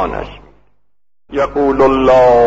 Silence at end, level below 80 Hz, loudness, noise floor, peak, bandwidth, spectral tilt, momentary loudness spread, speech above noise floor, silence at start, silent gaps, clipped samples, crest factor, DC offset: 0 s; -34 dBFS; -12 LUFS; -74 dBFS; -2 dBFS; 7.8 kHz; -7 dB/octave; 16 LU; 63 dB; 0 s; none; under 0.1%; 10 dB; under 0.1%